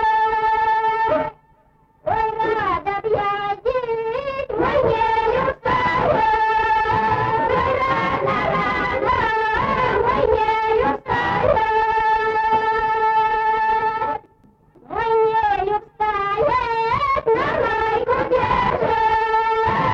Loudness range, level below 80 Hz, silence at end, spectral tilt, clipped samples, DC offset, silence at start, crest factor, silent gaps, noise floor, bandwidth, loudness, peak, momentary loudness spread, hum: 3 LU; -42 dBFS; 0 s; -6.5 dB/octave; under 0.1%; under 0.1%; 0 s; 12 dB; none; -56 dBFS; 7.2 kHz; -19 LUFS; -6 dBFS; 5 LU; none